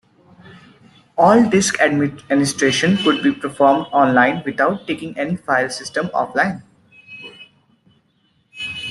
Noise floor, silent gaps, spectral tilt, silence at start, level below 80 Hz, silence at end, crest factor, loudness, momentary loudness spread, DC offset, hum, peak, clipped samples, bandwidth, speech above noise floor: -62 dBFS; none; -4.5 dB/octave; 0.5 s; -58 dBFS; 0 s; 16 dB; -17 LUFS; 16 LU; under 0.1%; none; -2 dBFS; under 0.1%; 12.5 kHz; 45 dB